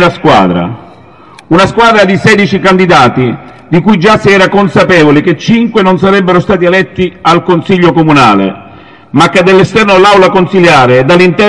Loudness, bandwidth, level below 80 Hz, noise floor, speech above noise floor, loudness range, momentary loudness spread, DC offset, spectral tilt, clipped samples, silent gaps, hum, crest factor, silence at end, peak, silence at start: -6 LUFS; 11.5 kHz; -36 dBFS; -34 dBFS; 29 dB; 2 LU; 6 LU; 0.6%; -6 dB/octave; 4%; none; none; 6 dB; 0 s; 0 dBFS; 0 s